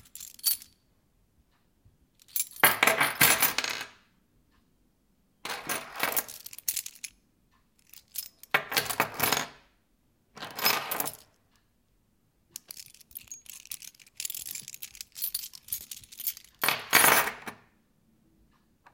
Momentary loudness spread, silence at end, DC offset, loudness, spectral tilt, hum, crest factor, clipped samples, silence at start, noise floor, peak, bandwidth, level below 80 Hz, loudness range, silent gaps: 23 LU; 1.4 s; under 0.1%; -27 LUFS; -0.5 dB/octave; none; 30 dB; under 0.1%; 0.15 s; -70 dBFS; -4 dBFS; 17 kHz; -68 dBFS; 12 LU; none